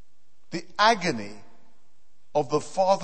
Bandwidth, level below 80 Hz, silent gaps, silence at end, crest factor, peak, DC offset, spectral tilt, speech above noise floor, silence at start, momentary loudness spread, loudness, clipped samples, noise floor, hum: 8.8 kHz; -68 dBFS; none; 0 s; 22 dB; -6 dBFS; 1%; -4 dB/octave; 46 dB; 0.5 s; 16 LU; -25 LUFS; under 0.1%; -70 dBFS; none